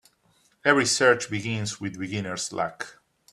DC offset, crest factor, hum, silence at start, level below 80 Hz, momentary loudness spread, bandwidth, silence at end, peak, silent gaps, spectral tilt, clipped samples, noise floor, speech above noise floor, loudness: under 0.1%; 24 dB; none; 0.65 s; -64 dBFS; 12 LU; 13.5 kHz; 0.4 s; -4 dBFS; none; -3.5 dB/octave; under 0.1%; -65 dBFS; 40 dB; -25 LUFS